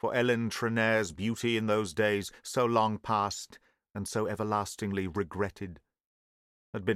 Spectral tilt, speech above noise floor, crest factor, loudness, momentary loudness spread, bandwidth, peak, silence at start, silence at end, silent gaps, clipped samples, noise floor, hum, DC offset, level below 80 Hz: -5 dB/octave; over 60 dB; 20 dB; -31 LUFS; 13 LU; 15.5 kHz; -12 dBFS; 0.05 s; 0 s; 6.05-6.73 s; under 0.1%; under -90 dBFS; none; under 0.1%; -62 dBFS